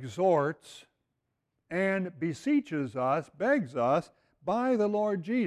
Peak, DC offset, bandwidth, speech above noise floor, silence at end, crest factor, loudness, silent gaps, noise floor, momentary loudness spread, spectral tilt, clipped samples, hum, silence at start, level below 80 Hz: -14 dBFS; under 0.1%; 12 kHz; 53 dB; 0 s; 16 dB; -29 LUFS; none; -82 dBFS; 7 LU; -7 dB/octave; under 0.1%; none; 0 s; -70 dBFS